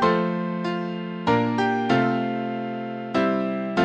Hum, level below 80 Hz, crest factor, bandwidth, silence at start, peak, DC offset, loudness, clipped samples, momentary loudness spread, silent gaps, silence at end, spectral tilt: none; -60 dBFS; 18 dB; 8.4 kHz; 0 s; -6 dBFS; under 0.1%; -24 LUFS; under 0.1%; 8 LU; none; 0 s; -7 dB/octave